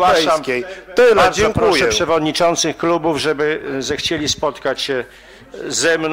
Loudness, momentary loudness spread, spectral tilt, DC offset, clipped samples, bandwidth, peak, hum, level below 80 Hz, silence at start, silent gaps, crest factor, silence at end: -16 LUFS; 9 LU; -3 dB/octave; under 0.1%; under 0.1%; 16 kHz; -4 dBFS; none; -42 dBFS; 0 s; none; 12 dB; 0 s